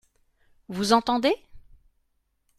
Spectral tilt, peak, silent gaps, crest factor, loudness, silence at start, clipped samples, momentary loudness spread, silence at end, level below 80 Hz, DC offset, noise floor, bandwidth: -4 dB/octave; -6 dBFS; none; 22 dB; -24 LUFS; 0.7 s; under 0.1%; 11 LU; 1 s; -58 dBFS; under 0.1%; -72 dBFS; 14.5 kHz